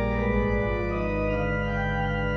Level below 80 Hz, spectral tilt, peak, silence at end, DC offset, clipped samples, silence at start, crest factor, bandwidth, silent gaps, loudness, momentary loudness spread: -32 dBFS; -8.5 dB/octave; -12 dBFS; 0 s; under 0.1%; under 0.1%; 0 s; 14 dB; 6.2 kHz; none; -26 LUFS; 2 LU